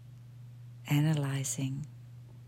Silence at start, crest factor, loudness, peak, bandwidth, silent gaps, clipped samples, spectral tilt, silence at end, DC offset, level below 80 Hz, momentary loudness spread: 0 s; 16 dB; -32 LUFS; -18 dBFS; 16 kHz; none; under 0.1%; -5.5 dB/octave; 0 s; under 0.1%; -68 dBFS; 22 LU